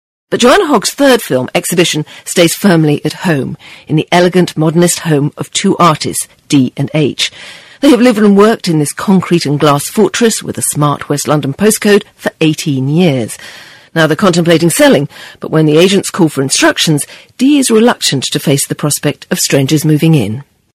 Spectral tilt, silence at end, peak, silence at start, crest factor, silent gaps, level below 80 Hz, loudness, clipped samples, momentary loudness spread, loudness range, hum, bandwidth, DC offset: -4.5 dB/octave; 0.3 s; 0 dBFS; 0.3 s; 10 dB; none; -48 dBFS; -10 LUFS; 0.4%; 8 LU; 2 LU; none; 16 kHz; under 0.1%